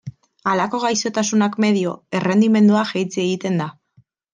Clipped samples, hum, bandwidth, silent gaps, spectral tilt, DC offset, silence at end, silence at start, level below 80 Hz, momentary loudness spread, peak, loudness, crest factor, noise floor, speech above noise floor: under 0.1%; none; 9.6 kHz; none; -5 dB/octave; under 0.1%; 0.6 s; 0.05 s; -66 dBFS; 9 LU; -6 dBFS; -19 LUFS; 14 dB; -57 dBFS; 40 dB